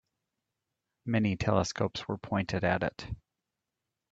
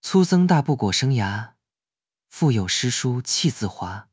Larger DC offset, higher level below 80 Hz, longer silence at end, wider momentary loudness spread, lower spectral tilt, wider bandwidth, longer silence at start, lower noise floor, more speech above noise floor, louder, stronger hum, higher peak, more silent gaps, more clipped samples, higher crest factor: neither; second, -56 dBFS vs -50 dBFS; first, 0.95 s vs 0.1 s; first, 15 LU vs 12 LU; about the same, -6 dB/octave vs -5 dB/octave; about the same, 7.8 kHz vs 8 kHz; first, 1.05 s vs 0.05 s; about the same, -87 dBFS vs under -90 dBFS; second, 57 dB vs over 69 dB; second, -31 LUFS vs -21 LUFS; neither; second, -10 dBFS vs -4 dBFS; neither; neither; about the same, 22 dB vs 18 dB